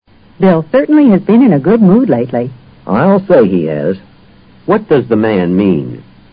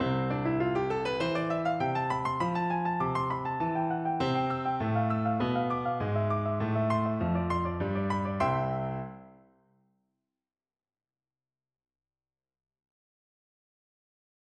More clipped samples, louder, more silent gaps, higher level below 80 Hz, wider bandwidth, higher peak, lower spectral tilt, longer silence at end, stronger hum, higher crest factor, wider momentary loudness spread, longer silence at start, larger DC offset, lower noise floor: neither; first, -10 LUFS vs -30 LUFS; neither; first, -44 dBFS vs -56 dBFS; second, 5 kHz vs 9.4 kHz; first, 0 dBFS vs -14 dBFS; first, -12.5 dB/octave vs -8 dB/octave; second, 0.3 s vs 5.25 s; neither; second, 10 dB vs 16 dB; first, 11 LU vs 2 LU; first, 0.4 s vs 0 s; neither; second, -41 dBFS vs under -90 dBFS